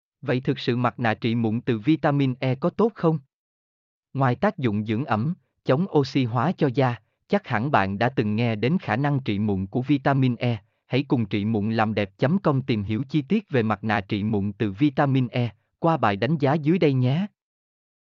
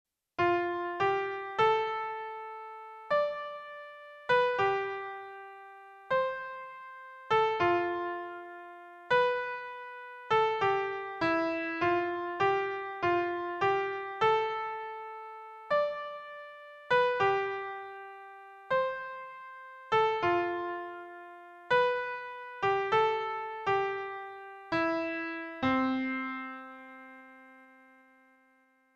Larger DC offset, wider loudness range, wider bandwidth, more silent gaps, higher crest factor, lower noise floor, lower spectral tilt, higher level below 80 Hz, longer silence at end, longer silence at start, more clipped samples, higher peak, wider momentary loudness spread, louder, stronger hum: neither; about the same, 2 LU vs 3 LU; second, 6.8 kHz vs 8 kHz; first, 3.33-4.03 s vs none; about the same, 16 dB vs 18 dB; first, under -90 dBFS vs -68 dBFS; first, -8.5 dB/octave vs -5.5 dB/octave; about the same, -64 dBFS vs -68 dBFS; second, 0.85 s vs 1.3 s; second, 0.25 s vs 0.4 s; neither; first, -6 dBFS vs -14 dBFS; second, 5 LU vs 19 LU; first, -24 LUFS vs -31 LUFS; neither